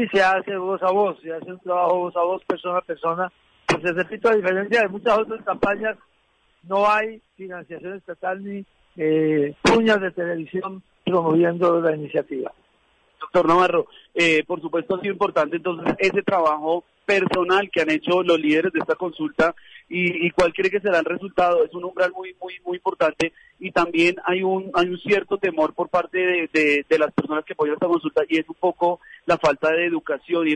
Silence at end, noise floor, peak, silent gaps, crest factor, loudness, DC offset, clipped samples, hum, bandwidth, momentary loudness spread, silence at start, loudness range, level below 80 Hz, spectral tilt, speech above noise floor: 0 s; -63 dBFS; -6 dBFS; none; 16 dB; -21 LUFS; under 0.1%; under 0.1%; none; 10.5 kHz; 12 LU; 0 s; 3 LU; -56 dBFS; -5.5 dB/octave; 42 dB